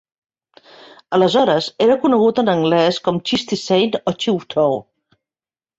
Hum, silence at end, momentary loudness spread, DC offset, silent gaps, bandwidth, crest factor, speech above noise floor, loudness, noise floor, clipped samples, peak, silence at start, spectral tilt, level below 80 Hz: none; 1 s; 6 LU; under 0.1%; none; 8 kHz; 16 dB; over 74 dB; -17 LUFS; under -90 dBFS; under 0.1%; -2 dBFS; 1.1 s; -5.5 dB/octave; -60 dBFS